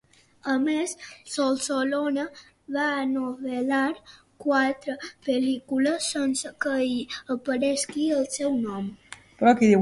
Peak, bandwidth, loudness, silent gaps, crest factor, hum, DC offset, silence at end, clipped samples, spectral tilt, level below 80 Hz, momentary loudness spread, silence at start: -6 dBFS; 11.5 kHz; -26 LUFS; none; 18 dB; none; under 0.1%; 0 s; under 0.1%; -4 dB/octave; -66 dBFS; 10 LU; 0.45 s